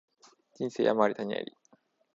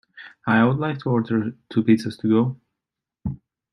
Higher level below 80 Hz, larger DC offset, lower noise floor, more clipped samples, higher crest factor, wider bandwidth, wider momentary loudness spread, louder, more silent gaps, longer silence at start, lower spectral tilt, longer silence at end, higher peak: second, -78 dBFS vs -52 dBFS; neither; second, -67 dBFS vs -86 dBFS; neither; first, 24 dB vs 18 dB; second, 7.8 kHz vs 11 kHz; about the same, 12 LU vs 14 LU; second, -30 LUFS vs -22 LUFS; neither; first, 0.6 s vs 0.15 s; second, -6 dB/octave vs -8 dB/octave; first, 0.7 s vs 0.35 s; second, -10 dBFS vs -4 dBFS